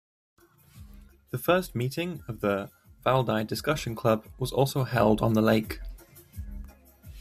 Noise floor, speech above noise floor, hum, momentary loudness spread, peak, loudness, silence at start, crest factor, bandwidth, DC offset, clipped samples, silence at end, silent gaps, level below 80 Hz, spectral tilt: -51 dBFS; 25 dB; none; 20 LU; -8 dBFS; -27 LUFS; 0.75 s; 20 dB; 15.5 kHz; under 0.1%; under 0.1%; 0 s; none; -48 dBFS; -6 dB/octave